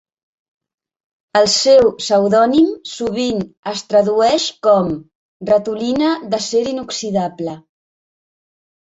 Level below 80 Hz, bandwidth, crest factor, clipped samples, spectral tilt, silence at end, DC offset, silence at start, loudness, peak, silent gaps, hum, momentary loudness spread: -54 dBFS; 8.2 kHz; 16 dB; under 0.1%; -4 dB/octave; 1.35 s; under 0.1%; 1.35 s; -16 LUFS; -2 dBFS; 3.57-3.63 s, 5.15-5.40 s; none; 12 LU